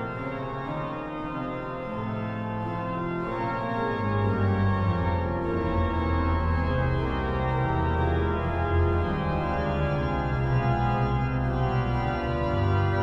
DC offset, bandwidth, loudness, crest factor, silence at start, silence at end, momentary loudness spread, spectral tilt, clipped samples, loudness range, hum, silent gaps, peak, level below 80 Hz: under 0.1%; 5.8 kHz; -27 LUFS; 12 dB; 0 s; 0 s; 7 LU; -9 dB/octave; under 0.1%; 5 LU; none; none; -14 dBFS; -36 dBFS